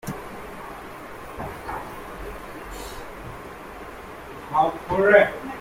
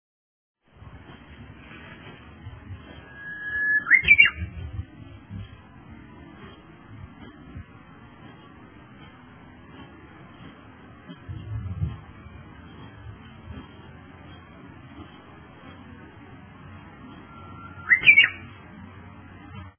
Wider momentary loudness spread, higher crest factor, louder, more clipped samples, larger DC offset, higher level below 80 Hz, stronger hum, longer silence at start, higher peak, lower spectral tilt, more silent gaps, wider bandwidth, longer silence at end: second, 21 LU vs 30 LU; about the same, 24 dB vs 26 dB; second, -23 LUFS vs -18 LUFS; neither; neither; about the same, -46 dBFS vs -48 dBFS; neither; second, 0.05 s vs 0.85 s; about the same, -2 dBFS vs -2 dBFS; first, -5.5 dB/octave vs -1 dB/octave; neither; first, 16.5 kHz vs 3.5 kHz; about the same, 0 s vs 0.1 s